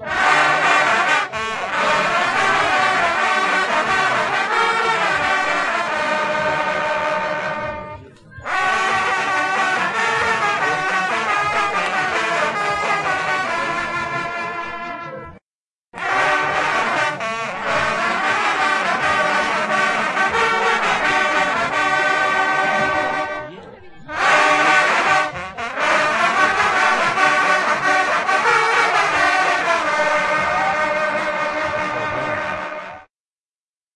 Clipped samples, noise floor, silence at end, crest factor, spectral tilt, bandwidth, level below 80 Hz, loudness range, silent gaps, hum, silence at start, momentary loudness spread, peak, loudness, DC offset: under 0.1%; under -90 dBFS; 0.9 s; 18 dB; -2.5 dB/octave; 11.5 kHz; -54 dBFS; 5 LU; 15.42-15.85 s; none; 0 s; 9 LU; 0 dBFS; -17 LUFS; under 0.1%